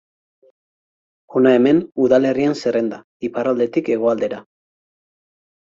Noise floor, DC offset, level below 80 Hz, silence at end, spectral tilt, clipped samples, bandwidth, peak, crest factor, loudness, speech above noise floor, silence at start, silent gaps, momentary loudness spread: under -90 dBFS; under 0.1%; -62 dBFS; 1.35 s; -7 dB/octave; under 0.1%; 7.6 kHz; -2 dBFS; 18 dB; -18 LUFS; over 73 dB; 1.3 s; 3.04-3.20 s; 12 LU